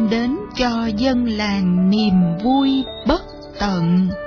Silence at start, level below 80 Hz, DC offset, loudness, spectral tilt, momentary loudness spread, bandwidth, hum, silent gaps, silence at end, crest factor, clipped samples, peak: 0 s; -38 dBFS; under 0.1%; -18 LUFS; -7 dB/octave; 6 LU; 5.4 kHz; none; none; 0 s; 12 dB; under 0.1%; -4 dBFS